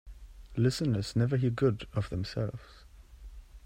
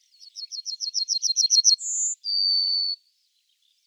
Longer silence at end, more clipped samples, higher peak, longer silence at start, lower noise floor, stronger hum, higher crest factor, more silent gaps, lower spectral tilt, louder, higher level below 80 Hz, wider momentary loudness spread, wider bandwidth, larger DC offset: second, 0.05 s vs 0.9 s; neither; second, -14 dBFS vs -6 dBFS; second, 0.05 s vs 0.2 s; second, -50 dBFS vs -69 dBFS; neither; about the same, 18 dB vs 18 dB; neither; first, -7 dB/octave vs 12.5 dB/octave; second, -31 LUFS vs -21 LUFS; first, -50 dBFS vs under -90 dBFS; second, 11 LU vs 18 LU; about the same, 14.5 kHz vs 15.5 kHz; neither